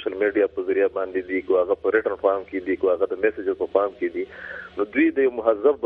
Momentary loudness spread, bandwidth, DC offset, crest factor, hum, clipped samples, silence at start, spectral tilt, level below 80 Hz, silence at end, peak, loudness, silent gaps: 8 LU; 4.3 kHz; under 0.1%; 18 dB; none; under 0.1%; 0 s; -8 dB/octave; -58 dBFS; 0 s; -4 dBFS; -23 LUFS; none